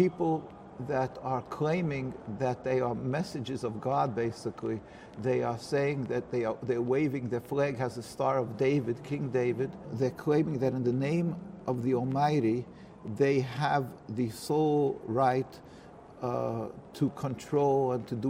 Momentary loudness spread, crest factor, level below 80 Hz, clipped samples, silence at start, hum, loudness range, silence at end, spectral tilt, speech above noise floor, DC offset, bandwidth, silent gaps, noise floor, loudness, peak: 10 LU; 18 dB; -64 dBFS; under 0.1%; 0 s; none; 3 LU; 0 s; -7.5 dB/octave; 20 dB; under 0.1%; 16 kHz; none; -50 dBFS; -31 LUFS; -14 dBFS